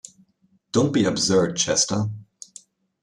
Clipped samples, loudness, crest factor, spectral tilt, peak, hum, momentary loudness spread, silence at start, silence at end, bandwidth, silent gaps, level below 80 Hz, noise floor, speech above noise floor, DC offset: under 0.1%; -21 LUFS; 18 dB; -4 dB/octave; -6 dBFS; none; 22 LU; 0.75 s; 0.8 s; 12.5 kHz; none; -58 dBFS; -64 dBFS; 43 dB; under 0.1%